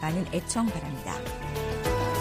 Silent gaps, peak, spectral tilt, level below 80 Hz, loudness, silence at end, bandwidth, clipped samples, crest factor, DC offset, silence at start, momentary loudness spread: none; -12 dBFS; -5 dB/octave; -40 dBFS; -30 LUFS; 0 s; 15.5 kHz; under 0.1%; 16 dB; under 0.1%; 0 s; 7 LU